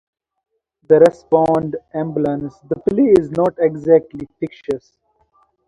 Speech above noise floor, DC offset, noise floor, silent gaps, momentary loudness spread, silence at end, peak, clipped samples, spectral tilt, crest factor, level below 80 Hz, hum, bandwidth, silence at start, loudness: 43 dB; under 0.1%; -59 dBFS; none; 15 LU; 0.9 s; 0 dBFS; under 0.1%; -8.5 dB/octave; 18 dB; -52 dBFS; none; 10.5 kHz; 0.9 s; -16 LUFS